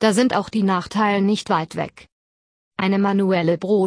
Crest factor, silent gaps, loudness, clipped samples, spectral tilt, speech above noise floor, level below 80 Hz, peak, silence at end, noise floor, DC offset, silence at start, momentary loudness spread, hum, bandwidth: 16 dB; 2.12-2.71 s; -20 LUFS; under 0.1%; -6 dB/octave; over 71 dB; -58 dBFS; -4 dBFS; 0 s; under -90 dBFS; under 0.1%; 0 s; 10 LU; none; 11 kHz